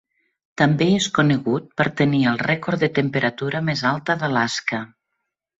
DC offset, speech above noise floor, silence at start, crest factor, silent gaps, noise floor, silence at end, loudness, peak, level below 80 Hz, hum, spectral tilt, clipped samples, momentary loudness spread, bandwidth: under 0.1%; 58 dB; 0.6 s; 18 dB; none; -78 dBFS; 0.75 s; -20 LUFS; -4 dBFS; -58 dBFS; none; -5.5 dB/octave; under 0.1%; 6 LU; 8 kHz